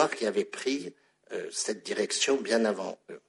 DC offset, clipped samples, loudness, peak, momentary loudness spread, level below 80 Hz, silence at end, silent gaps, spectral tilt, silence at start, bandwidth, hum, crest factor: under 0.1%; under 0.1%; -30 LUFS; -8 dBFS; 13 LU; -80 dBFS; 0.1 s; none; -2.5 dB/octave; 0 s; 11.5 kHz; none; 22 dB